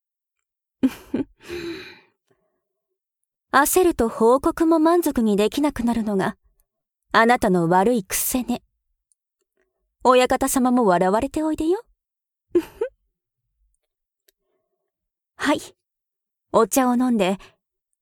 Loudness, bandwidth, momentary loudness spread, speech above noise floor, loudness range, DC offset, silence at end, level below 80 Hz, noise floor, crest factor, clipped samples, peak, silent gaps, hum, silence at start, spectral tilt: -20 LUFS; 19 kHz; 13 LU; 67 dB; 12 LU; under 0.1%; 0.65 s; -48 dBFS; -87 dBFS; 20 dB; under 0.1%; -2 dBFS; none; none; 0.85 s; -4.5 dB/octave